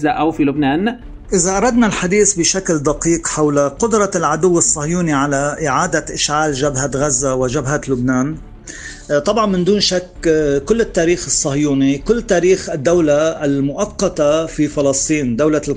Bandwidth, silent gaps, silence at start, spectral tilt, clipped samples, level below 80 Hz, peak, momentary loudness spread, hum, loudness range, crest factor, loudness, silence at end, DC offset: 10 kHz; none; 0 s; -4 dB/octave; under 0.1%; -36 dBFS; -2 dBFS; 5 LU; none; 3 LU; 14 dB; -15 LUFS; 0 s; under 0.1%